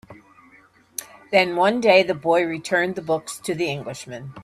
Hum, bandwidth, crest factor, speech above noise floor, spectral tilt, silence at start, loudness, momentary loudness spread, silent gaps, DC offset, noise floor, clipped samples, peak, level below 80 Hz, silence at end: none; 14 kHz; 20 dB; 33 dB; -4 dB/octave; 0.1 s; -20 LUFS; 18 LU; none; under 0.1%; -54 dBFS; under 0.1%; -4 dBFS; -64 dBFS; 0 s